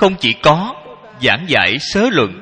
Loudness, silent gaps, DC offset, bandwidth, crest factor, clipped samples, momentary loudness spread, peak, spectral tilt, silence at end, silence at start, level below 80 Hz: -14 LUFS; none; under 0.1%; 11 kHz; 14 dB; 0.1%; 6 LU; 0 dBFS; -4.5 dB/octave; 0 s; 0 s; -42 dBFS